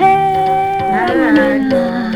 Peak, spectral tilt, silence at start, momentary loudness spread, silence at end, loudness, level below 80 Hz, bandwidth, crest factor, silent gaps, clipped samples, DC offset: 0 dBFS; -6.5 dB/octave; 0 s; 4 LU; 0 s; -13 LUFS; -44 dBFS; 13.5 kHz; 12 dB; none; under 0.1%; under 0.1%